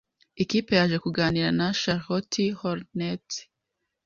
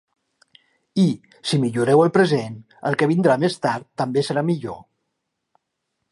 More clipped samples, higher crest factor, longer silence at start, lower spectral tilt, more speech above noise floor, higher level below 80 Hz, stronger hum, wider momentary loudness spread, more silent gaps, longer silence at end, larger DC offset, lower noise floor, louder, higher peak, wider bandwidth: neither; about the same, 20 dB vs 20 dB; second, 0.35 s vs 0.95 s; second, -5 dB/octave vs -6.5 dB/octave; about the same, 56 dB vs 58 dB; first, -56 dBFS vs -66 dBFS; neither; second, 9 LU vs 12 LU; neither; second, 0.6 s vs 1.3 s; neither; first, -81 dBFS vs -77 dBFS; second, -26 LUFS vs -20 LUFS; second, -6 dBFS vs -2 dBFS; second, 7.4 kHz vs 11.5 kHz